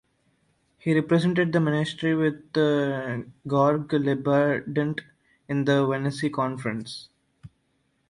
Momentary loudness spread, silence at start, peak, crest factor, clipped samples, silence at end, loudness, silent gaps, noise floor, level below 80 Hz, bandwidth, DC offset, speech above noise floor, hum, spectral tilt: 10 LU; 0.85 s; -8 dBFS; 18 dB; under 0.1%; 0.65 s; -25 LUFS; none; -70 dBFS; -64 dBFS; 11.5 kHz; under 0.1%; 47 dB; none; -7 dB/octave